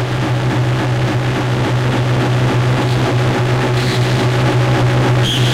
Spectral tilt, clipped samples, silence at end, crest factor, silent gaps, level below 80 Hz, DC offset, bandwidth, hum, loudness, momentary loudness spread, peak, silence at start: -6 dB/octave; under 0.1%; 0 s; 8 dB; none; -34 dBFS; under 0.1%; 13 kHz; none; -15 LUFS; 3 LU; -6 dBFS; 0 s